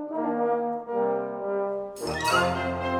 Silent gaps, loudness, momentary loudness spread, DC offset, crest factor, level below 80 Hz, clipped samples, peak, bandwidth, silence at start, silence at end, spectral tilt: none; -27 LUFS; 7 LU; under 0.1%; 18 dB; -58 dBFS; under 0.1%; -8 dBFS; 19.5 kHz; 0 s; 0 s; -4.5 dB/octave